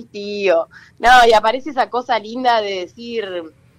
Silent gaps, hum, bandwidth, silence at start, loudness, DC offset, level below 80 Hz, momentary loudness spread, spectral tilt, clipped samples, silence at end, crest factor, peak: none; none; 15.5 kHz; 0 s; -16 LUFS; under 0.1%; -44 dBFS; 17 LU; -3 dB/octave; under 0.1%; 0.3 s; 14 dB; -2 dBFS